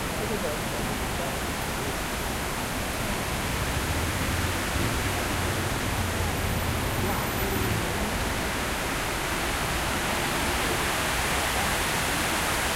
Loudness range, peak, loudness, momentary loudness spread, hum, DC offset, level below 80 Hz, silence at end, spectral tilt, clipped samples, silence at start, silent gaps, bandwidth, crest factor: 3 LU; -14 dBFS; -27 LUFS; 4 LU; none; under 0.1%; -36 dBFS; 0 s; -3.5 dB/octave; under 0.1%; 0 s; none; 16 kHz; 14 dB